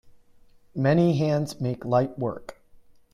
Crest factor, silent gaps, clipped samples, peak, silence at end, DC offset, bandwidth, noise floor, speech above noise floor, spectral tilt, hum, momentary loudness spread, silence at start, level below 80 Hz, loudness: 18 dB; none; under 0.1%; -8 dBFS; 0.6 s; under 0.1%; 13.5 kHz; -55 dBFS; 31 dB; -8 dB/octave; none; 18 LU; 0.75 s; -58 dBFS; -25 LUFS